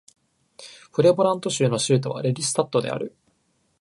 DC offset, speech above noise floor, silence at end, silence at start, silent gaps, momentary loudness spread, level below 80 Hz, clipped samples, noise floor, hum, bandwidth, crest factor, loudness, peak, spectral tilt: under 0.1%; 46 dB; 0.7 s; 0.6 s; none; 15 LU; -66 dBFS; under 0.1%; -68 dBFS; none; 11.5 kHz; 20 dB; -22 LUFS; -4 dBFS; -5 dB/octave